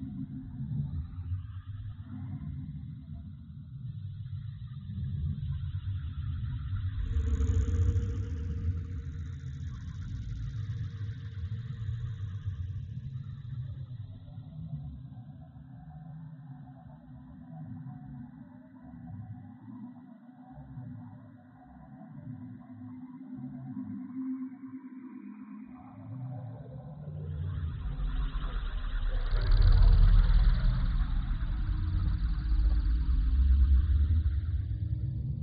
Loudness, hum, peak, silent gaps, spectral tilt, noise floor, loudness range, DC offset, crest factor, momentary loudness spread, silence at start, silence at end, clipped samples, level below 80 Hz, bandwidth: -34 LUFS; none; -12 dBFS; none; -8 dB/octave; -53 dBFS; 18 LU; under 0.1%; 20 dB; 20 LU; 0 s; 0 s; under 0.1%; -32 dBFS; 6.8 kHz